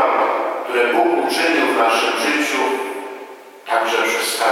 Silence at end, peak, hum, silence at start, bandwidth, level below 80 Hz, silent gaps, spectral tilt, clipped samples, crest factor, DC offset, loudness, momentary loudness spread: 0 s; -2 dBFS; none; 0 s; 16.5 kHz; -74 dBFS; none; -1 dB/octave; under 0.1%; 16 dB; under 0.1%; -17 LUFS; 14 LU